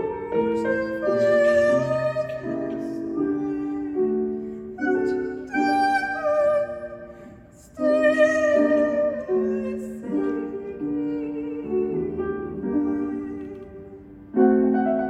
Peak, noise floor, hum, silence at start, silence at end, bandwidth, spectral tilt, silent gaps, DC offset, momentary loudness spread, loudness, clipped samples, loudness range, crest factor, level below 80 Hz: -6 dBFS; -46 dBFS; none; 0 s; 0 s; 11 kHz; -6.5 dB/octave; none; under 0.1%; 14 LU; -23 LUFS; under 0.1%; 5 LU; 18 dB; -54 dBFS